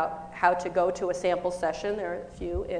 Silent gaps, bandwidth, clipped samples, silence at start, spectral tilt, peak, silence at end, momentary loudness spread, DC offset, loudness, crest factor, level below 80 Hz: none; 10 kHz; under 0.1%; 0 s; -5 dB/octave; -8 dBFS; 0 s; 9 LU; under 0.1%; -28 LUFS; 20 dB; -48 dBFS